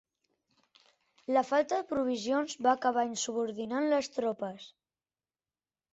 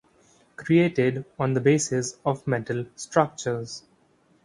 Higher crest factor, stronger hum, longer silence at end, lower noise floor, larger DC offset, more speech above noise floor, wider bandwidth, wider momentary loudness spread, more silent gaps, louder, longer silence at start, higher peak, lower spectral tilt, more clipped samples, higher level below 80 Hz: about the same, 20 dB vs 22 dB; neither; first, 1.25 s vs 0.65 s; first, under -90 dBFS vs -62 dBFS; neither; first, over 59 dB vs 38 dB; second, 8.2 kHz vs 11.5 kHz; second, 8 LU vs 11 LU; neither; second, -31 LUFS vs -25 LUFS; first, 1.3 s vs 0.6 s; second, -14 dBFS vs -4 dBFS; second, -3.5 dB/octave vs -5.5 dB/octave; neither; second, -76 dBFS vs -62 dBFS